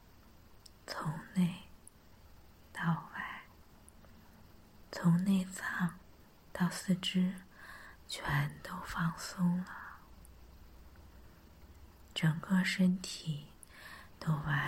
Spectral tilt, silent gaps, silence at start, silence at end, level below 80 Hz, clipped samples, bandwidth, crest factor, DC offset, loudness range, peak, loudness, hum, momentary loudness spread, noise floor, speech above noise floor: -5.5 dB/octave; none; 0.45 s; 0 s; -60 dBFS; under 0.1%; 16 kHz; 18 dB; under 0.1%; 6 LU; -20 dBFS; -35 LUFS; none; 20 LU; -60 dBFS; 26 dB